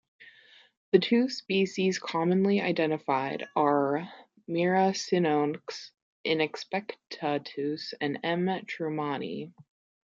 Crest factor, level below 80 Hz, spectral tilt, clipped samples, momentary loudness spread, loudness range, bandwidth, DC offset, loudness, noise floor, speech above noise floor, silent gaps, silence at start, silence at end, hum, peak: 22 dB; -78 dBFS; -5.5 dB/octave; under 0.1%; 13 LU; 5 LU; 7.6 kHz; under 0.1%; -29 LUFS; -57 dBFS; 29 dB; 0.77-0.92 s, 6.02-6.24 s; 0.2 s; 0.55 s; none; -8 dBFS